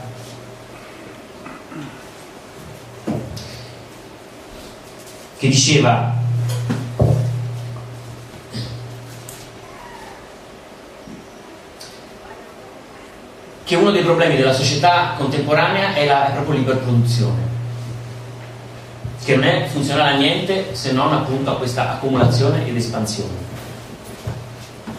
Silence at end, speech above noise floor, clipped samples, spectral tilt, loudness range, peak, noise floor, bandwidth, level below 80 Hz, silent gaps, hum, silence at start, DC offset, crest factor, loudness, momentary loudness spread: 0 s; 23 dB; under 0.1%; -5 dB/octave; 19 LU; 0 dBFS; -39 dBFS; 14.5 kHz; -46 dBFS; none; none; 0 s; under 0.1%; 20 dB; -18 LUFS; 23 LU